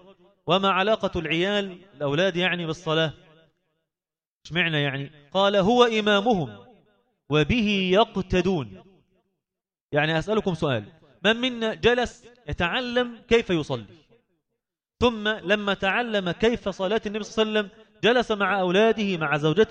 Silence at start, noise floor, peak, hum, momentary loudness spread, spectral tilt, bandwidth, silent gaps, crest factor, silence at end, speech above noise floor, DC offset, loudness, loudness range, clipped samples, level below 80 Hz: 0.45 s; under -90 dBFS; -4 dBFS; none; 9 LU; -5.5 dB/octave; 8.8 kHz; 4.27-4.41 s, 9.81-9.89 s; 20 dB; 0 s; over 67 dB; under 0.1%; -23 LUFS; 4 LU; under 0.1%; -48 dBFS